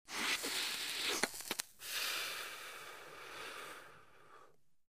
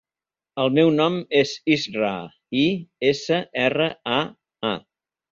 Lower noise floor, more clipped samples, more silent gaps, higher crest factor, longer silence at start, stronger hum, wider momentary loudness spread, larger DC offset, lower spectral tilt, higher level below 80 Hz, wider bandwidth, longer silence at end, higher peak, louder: second, -67 dBFS vs under -90 dBFS; neither; neither; first, 32 dB vs 18 dB; second, 0.05 s vs 0.55 s; neither; first, 15 LU vs 10 LU; neither; second, 0.5 dB/octave vs -5.5 dB/octave; second, -78 dBFS vs -62 dBFS; first, 15.5 kHz vs 7.6 kHz; second, 0.05 s vs 0.5 s; second, -12 dBFS vs -4 dBFS; second, -39 LUFS vs -22 LUFS